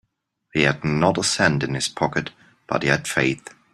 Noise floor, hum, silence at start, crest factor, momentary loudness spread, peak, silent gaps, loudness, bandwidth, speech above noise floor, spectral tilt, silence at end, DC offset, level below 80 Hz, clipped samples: -74 dBFS; none; 0.55 s; 20 dB; 8 LU; -2 dBFS; none; -21 LUFS; 14.5 kHz; 52 dB; -4 dB/octave; 0.35 s; under 0.1%; -52 dBFS; under 0.1%